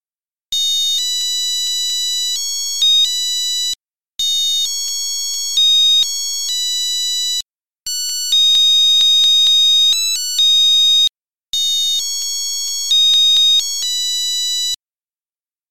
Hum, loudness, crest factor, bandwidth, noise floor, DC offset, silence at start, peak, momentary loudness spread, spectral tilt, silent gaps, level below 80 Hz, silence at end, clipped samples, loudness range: none; -12 LUFS; 10 dB; 16.5 kHz; under -90 dBFS; 2%; 0 s; -6 dBFS; 10 LU; 5.5 dB/octave; 14.76-14.80 s, 15.20-15.25 s; -62 dBFS; 0 s; under 0.1%; 5 LU